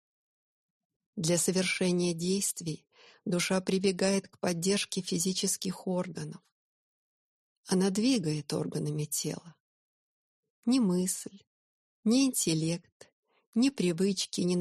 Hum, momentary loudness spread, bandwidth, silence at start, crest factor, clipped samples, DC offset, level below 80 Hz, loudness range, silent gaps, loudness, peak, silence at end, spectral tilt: none; 10 LU; 13 kHz; 1.15 s; 18 dB; under 0.1%; under 0.1%; -72 dBFS; 3 LU; 6.52-7.64 s, 9.60-10.43 s, 10.50-10.63 s, 11.47-12.03 s, 12.92-13.00 s, 13.12-13.23 s, 13.47-13.53 s; -30 LUFS; -14 dBFS; 0 s; -4.5 dB/octave